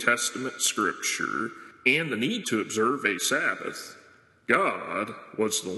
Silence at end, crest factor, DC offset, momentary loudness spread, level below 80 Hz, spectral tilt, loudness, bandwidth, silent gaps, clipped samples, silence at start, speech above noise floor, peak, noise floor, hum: 0 s; 22 dB; under 0.1%; 11 LU; -76 dBFS; -2 dB/octave; -26 LUFS; 12.5 kHz; none; under 0.1%; 0 s; 29 dB; -6 dBFS; -56 dBFS; none